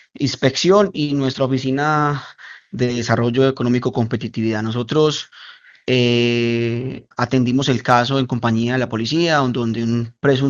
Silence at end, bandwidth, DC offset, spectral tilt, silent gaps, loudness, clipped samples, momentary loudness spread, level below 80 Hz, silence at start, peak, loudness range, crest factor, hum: 0 s; 7.6 kHz; under 0.1%; -6 dB/octave; none; -18 LUFS; under 0.1%; 8 LU; -54 dBFS; 0.2 s; 0 dBFS; 2 LU; 18 dB; none